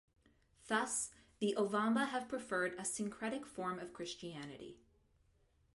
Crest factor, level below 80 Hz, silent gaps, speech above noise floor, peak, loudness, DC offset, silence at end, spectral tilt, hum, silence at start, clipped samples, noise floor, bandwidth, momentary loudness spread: 20 dB; -74 dBFS; none; 35 dB; -22 dBFS; -39 LUFS; under 0.1%; 1 s; -3.5 dB/octave; none; 0.65 s; under 0.1%; -74 dBFS; 11.5 kHz; 13 LU